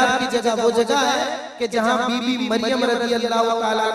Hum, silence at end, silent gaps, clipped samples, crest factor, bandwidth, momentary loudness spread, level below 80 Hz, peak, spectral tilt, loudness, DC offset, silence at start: none; 0 s; none; under 0.1%; 14 dB; 15 kHz; 4 LU; -60 dBFS; -6 dBFS; -3 dB/octave; -20 LUFS; under 0.1%; 0 s